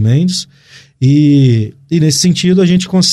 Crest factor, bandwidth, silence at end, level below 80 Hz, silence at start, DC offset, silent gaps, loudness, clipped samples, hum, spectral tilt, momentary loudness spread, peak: 10 dB; 13.5 kHz; 0 s; -48 dBFS; 0 s; under 0.1%; none; -11 LUFS; under 0.1%; none; -5.5 dB/octave; 8 LU; 0 dBFS